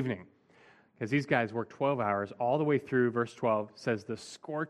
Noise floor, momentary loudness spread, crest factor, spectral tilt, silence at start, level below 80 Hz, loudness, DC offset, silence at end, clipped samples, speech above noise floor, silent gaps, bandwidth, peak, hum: -61 dBFS; 11 LU; 20 dB; -7 dB/octave; 0 s; -74 dBFS; -32 LUFS; under 0.1%; 0 s; under 0.1%; 30 dB; none; 11.5 kHz; -12 dBFS; none